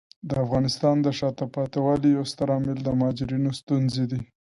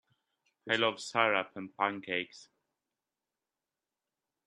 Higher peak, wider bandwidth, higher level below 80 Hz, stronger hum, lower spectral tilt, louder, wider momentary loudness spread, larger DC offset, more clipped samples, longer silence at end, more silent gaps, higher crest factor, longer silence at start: about the same, -8 dBFS vs -10 dBFS; about the same, 11.5 kHz vs 11.5 kHz; first, -52 dBFS vs -84 dBFS; neither; first, -7 dB/octave vs -3.5 dB/octave; first, -25 LUFS vs -32 LUFS; second, 6 LU vs 15 LU; neither; neither; second, 0.35 s vs 2.05 s; first, 3.63-3.67 s vs none; second, 16 dB vs 26 dB; second, 0.25 s vs 0.65 s